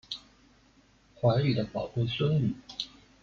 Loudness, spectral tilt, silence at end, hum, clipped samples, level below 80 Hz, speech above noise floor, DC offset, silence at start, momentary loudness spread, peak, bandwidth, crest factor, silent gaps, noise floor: -30 LUFS; -7.5 dB/octave; 0.35 s; none; under 0.1%; -58 dBFS; 34 dB; under 0.1%; 0.1 s; 14 LU; -14 dBFS; 7.4 kHz; 18 dB; none; -62 dBFS